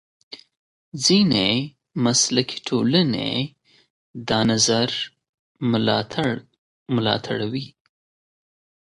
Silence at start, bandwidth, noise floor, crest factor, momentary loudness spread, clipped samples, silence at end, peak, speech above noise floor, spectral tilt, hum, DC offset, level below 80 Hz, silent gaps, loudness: 0.3 s; 11.5 kHz; under -90 dBFS; 20 dB; 19 LU; under 0.1%; 1.15 s; -4 dBFS; over 69 dB; -4 dB/octave; none; under 0.1%; -56 dBFS; 0.57-0.92 s, 3.90-4.14 s, 5.29-5.55 s, 6.58-6.86 s; -21 LUFS